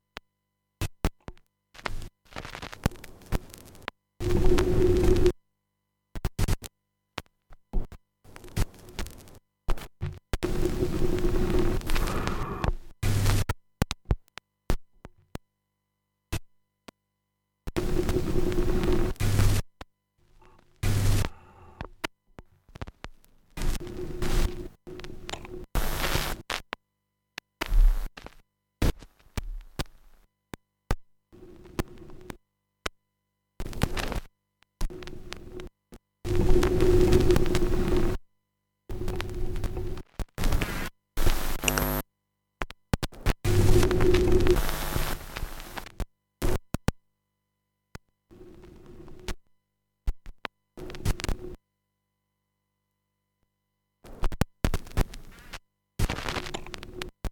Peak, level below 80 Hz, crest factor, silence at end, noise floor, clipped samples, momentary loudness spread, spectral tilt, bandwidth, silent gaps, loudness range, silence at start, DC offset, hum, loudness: -4 dBFS; -32 dBFS; 24 dB; 0 s; -80 dBFS; under 0.1%; 21 LU; -5.5 dB/octave; 18 kHz; none; 13 LU; 0.8 s; under 0.1%; 50 Hz at -50 dBFS; -30 LUFS